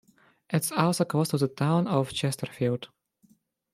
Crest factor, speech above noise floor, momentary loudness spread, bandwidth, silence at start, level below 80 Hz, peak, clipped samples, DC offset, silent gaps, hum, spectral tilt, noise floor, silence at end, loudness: 20 dB; 38 dB; 6 LU; 16 kHz; 0.5 s; -66 dBFS; -8 dBFS; under 0.1%; under 0.1%; none; none; -5.5 dB/octave; -64 dBFS; 0.85 s; -27 LUFS